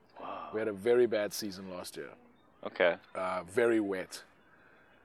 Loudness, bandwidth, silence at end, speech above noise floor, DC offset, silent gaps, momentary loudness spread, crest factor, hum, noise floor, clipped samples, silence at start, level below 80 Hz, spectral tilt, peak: -32 LUFS; 16 kHz; 0.8 s; 30 dB; under 0.1%; none; 17 LU; 22 dB; none; -62 dBFS; under 0.1%; 0.15 s; -80 dBFS; -4.5 dB/octave; -12 dBFS